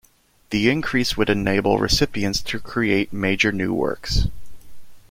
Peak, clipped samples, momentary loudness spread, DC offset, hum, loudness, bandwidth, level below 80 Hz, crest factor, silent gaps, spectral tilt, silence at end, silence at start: -4 dBFS; under 0.1%; 5 LU; under 0.1%; none; -21 LUFS; 16.5 kHz; -34 dBFS; 18 dB; none; -4.5 dB/octave; 0.1 s; 0.5 s